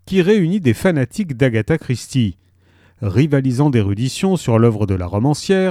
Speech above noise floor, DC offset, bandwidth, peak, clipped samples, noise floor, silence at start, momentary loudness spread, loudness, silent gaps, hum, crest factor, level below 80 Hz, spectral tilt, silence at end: 37 dB; under 0.1%; 14.5 kHz; -2 dBFS; under 0.1%; -52 dBFS; 0.05 s; 6 LU; -17 LUFS; none; none; 14 dB; -44 dBFS; -7 dB/octave; 0 s